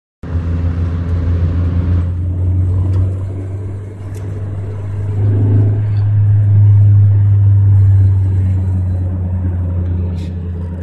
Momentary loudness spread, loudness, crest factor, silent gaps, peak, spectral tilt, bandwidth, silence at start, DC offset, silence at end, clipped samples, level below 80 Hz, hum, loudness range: 13 LU; -14 LUFS; 10 dB; none; -2 dBFS; -10.5 dB/octave; 2.8 kHz; 0.25 s; under 0.1%; 0 s; under 0.1%; -28 dBFS; none; 7 LU